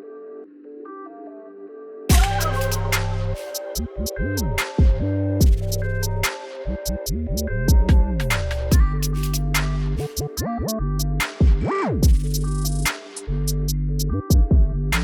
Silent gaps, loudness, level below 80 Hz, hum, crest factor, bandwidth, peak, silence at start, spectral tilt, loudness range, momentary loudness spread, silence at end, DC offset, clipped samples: none; -22 LUFS; -22 dBFS; none; 16 dB; 19.5 kHz; -4 dBFS; 0 s; -5 dB/octave; 3 LU; 18 LU; 0 s; under 0.1%; under 0.1%